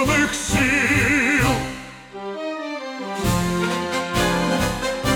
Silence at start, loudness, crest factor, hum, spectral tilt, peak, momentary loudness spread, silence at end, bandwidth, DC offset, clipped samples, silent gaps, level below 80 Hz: 0 s; -20 LUFS; 16 dB; none; -4 dB/octave; -6 dBFS; 13 LU; 0 s; 20 kHz; under 0.1%; under 0.1%; none; -36 dBFS